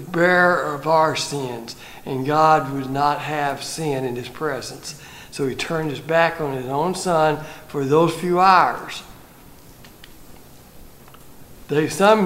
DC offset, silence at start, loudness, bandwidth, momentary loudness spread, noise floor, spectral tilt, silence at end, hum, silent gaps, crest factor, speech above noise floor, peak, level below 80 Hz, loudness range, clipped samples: under 0.1%; 0 s; -20 LUFS; 16 kHz; 16 LU; -44 dBFS; -5 dB/octave; 0 s; none; none; 20 dB; 25 dB; -2 dBFS; -52 dBFS; 6 LU; under 0.1%